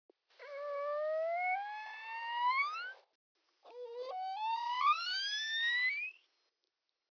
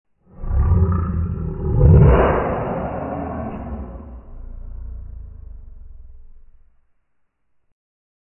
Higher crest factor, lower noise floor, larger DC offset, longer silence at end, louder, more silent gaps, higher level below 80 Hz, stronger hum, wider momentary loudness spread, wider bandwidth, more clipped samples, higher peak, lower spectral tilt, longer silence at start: about the same, 16 dB vs 18 dB; first, -86 dBFS vs -65 dBFS; neither; second, 1.05 s vs 1.95 s; second, -36 LUFS vs -18 LUFS; first, 3.15-3.35 s vs none; second, under -90 dBFS vs -26 dBFS; neither; second, 14 LU vs 27 LU; first, 5.4 kHz vs 3.1 kHz; neither; second, -22 dBFS vs -2 dBFS; second, 10.5 dB/octave vs -13.5 dB/octave; about the same, 0.4 s vs 0.4 s